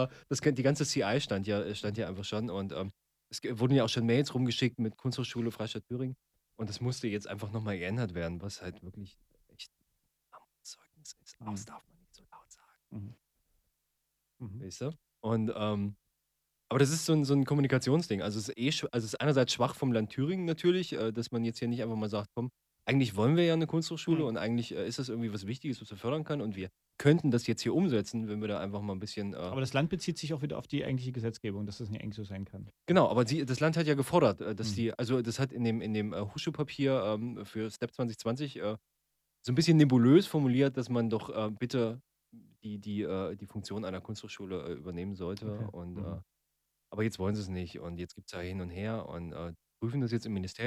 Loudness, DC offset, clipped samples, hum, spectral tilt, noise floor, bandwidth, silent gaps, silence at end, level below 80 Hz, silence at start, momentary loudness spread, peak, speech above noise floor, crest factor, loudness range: -32 LUFS; under 0.1%; under 0.1%; none; -6 dB/octave; -82 dBFS; 15 kHz; none; 0 s; -64 dBFS; 0 s; 15 LU; -12 dBFS; 50 dB; 22 dB; 12 LU